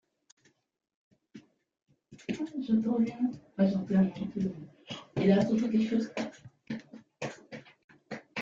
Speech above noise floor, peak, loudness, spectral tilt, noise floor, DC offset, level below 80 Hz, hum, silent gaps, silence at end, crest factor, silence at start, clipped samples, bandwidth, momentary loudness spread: 26 dB; -12 dBFS; -31 LUFS; -7.5 dB/octave; -55 dBFS; under 0.1%; -68 dBFS; none; 7.84-7.88 s; 0 s; 20 dB; 1.35 s; under 0.1%; 7.6 kHz; 19 LU